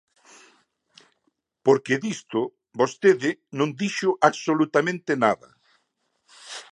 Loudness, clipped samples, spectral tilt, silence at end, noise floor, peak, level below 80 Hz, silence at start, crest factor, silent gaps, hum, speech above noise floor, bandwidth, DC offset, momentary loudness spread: -23 LUFS; under 0.1%; -5 dB/octave; 0.1 s; -73 dBFS; -2 dBFS; -76 dBFS; 1.65 s; 24 dB; none; none; 51 dB; 10.5 kHz; under 0.1%; 8 LU